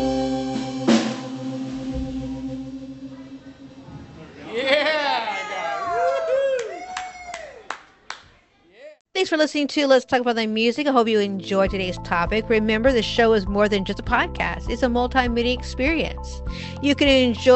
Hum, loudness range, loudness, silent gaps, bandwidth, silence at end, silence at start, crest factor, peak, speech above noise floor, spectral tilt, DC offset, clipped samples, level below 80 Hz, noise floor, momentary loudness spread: none; 7 LU; -22 LUFS; 9.01-9.05 s; 8.4 kHz; 0 s; 0 s; 18 dB; -4 dBFS; 35 dB; -5 dB/octave; under 0.1%; under 0.1%; -38 dBFS; -55 dBFS; 18 LU